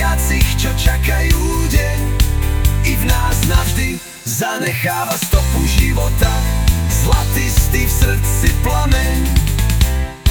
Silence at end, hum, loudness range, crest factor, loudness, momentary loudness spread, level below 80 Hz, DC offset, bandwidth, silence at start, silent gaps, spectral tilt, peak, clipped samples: 0 s; none; 1 LU; 14 dB; -16 LUFS; 3 LU; -16 dBFS; 0.2%; 19.5 kHz; 0 s; none; -4.5 dB/octave; 0 dBFS; under 0.1%